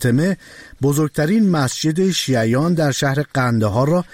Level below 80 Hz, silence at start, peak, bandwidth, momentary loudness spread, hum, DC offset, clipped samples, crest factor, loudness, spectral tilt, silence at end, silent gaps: -48 dBFS; 0 s; -6 dBFS; 16.5 kHz; 3 LU; none; 0.2%; under 0.1%; 10 dB; -18 LUFS; -5.5 dB/octave; 0.1 s; none